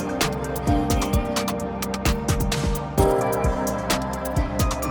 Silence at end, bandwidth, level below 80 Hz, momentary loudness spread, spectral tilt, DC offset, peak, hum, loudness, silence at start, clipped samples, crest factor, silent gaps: 0 s; 19.5 kHz; -30 dBFS; 5 LU; -5 dB/octave; under 0.1%; -6 dBFS; none; -24 LUFS; 0 s; under 0.1%; 18 dB; none